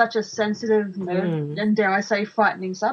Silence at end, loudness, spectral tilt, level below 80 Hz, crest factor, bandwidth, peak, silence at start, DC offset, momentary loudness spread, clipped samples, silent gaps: 0 s; -22 LUFS; -6 dB/octave; -70 dBFS; 16 dB; 7.4 kHz; -6 dBFS; 0 s; under 0.1%; 5 LU; under 0.1%; none